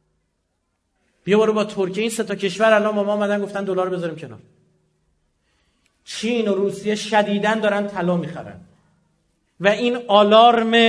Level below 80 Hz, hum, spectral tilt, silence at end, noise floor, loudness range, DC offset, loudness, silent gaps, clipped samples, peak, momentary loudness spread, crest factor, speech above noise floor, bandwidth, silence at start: -66 dBFS; none; -5 dB/octave; 0 s; -72 dBFS; 7 LU; under 0.1%; -19 LUFS; none; under 0.1%; 0 dBFS; 16 LU; 20 dB; 53 dB; 11 kHz; 1.25 s